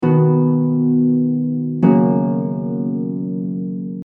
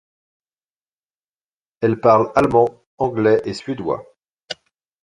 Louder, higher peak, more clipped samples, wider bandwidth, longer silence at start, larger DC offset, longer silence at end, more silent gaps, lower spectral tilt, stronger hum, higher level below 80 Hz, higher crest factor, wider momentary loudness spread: about the same, -17 LUFS vs -18 LUFS; about the same, -2 dBFS vs -2 dBFS; neither; second, 3.2 kHz vs 11 kHz; second, 0 s vs 1.8 s; neither; second, 0.05 s vs 0.5 s; second, none vs 2.87-2.98 s, 4.28-4.37 s; first, -13 dB/octave vs -7 dB/octave; neither; second, -58 dBFS vs -52 dBFS; about the same, 16 dB vs 20 dB; second, 9 LU vs 19 LU